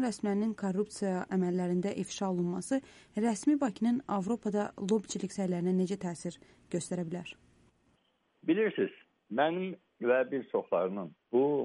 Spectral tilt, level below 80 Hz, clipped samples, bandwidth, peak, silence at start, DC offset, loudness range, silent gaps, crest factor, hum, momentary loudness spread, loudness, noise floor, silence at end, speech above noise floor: -6 dB/octave; -72 dBFS; under 0.1%; 11.5 kHz; -16 dBFS; 0 s; under 0.1%; 4 LU; none; 16 dB; none; 9 LU; -33 LUFS; -73 dBFS; 0 s; 41 dB